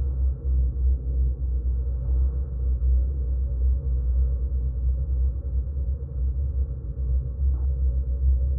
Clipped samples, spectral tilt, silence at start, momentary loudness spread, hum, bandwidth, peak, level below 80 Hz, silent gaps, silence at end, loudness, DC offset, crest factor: under 0.1%; -15 dB/octave; 0 s; 5 LU; none; 1.2 kHz; -12 dBFS; -24 dBFS; none; 0 s; -27 LUFS; under 0.1%; 12 dB